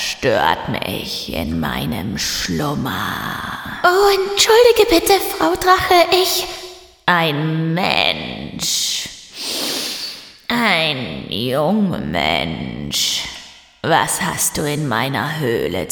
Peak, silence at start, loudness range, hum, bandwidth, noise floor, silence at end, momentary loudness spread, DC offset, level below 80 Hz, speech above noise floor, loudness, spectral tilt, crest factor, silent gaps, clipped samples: 0 dBFS; 0 s; 6 LU; none; 19 kHz; -38 dBFS; 0 s; 12 LU; under 0.1%; -42 dBFS; 22 dB; -17 LUFS; -3.5 dB/octave; 18 dB; none; under 0.1%